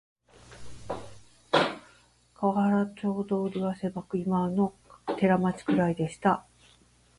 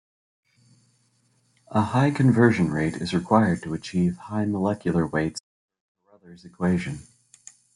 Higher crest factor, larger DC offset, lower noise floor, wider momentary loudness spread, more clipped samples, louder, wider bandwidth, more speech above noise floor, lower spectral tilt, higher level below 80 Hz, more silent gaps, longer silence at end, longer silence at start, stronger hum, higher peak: about the same, 20 dB vs 22 dB; neither; second, -61 dBFS vs -66 dBFS; first, 14 LU vs 10 LU; neither; second, -28 LUFS vs -23 LUFS; about the same, 11.5 kHz vs 11.5 kHz; second, 34 dB vs 43 dB; about the same, -7 dB/octave vs -7 dB/octave; about the same, -60 dBFS vs -56 dBFS; second, none vs 5.40-5.69 s, 5.80-5.95 s; about the same, 0.8 s vs 0.75 s; second, 0.5 s vs 1.7 s; neither; second, -8 dBFS vs -4 dBFS